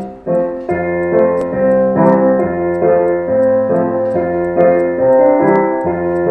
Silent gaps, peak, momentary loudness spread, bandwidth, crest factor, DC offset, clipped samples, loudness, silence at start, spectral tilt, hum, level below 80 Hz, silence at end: none; 0 dBFS; 6 LU; 2.9 kHz; 12 dB; under 0.1%; under 0.1%; -13 LUFS; 0 s; -10.5 dB/octave; none; -48 dBFS; 0 s